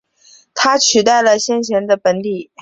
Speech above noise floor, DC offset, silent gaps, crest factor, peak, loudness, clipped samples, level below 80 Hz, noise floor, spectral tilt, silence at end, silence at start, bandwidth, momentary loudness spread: 34 dB; under 0.1%; none; 14 dB; -2 dBFS; -14 LUFS; under 0.1%; -58 dBFS; -48 dBFS; -2 dB/octave; 0.2 s; 0.55 s; 8.2 kHz; 10 LU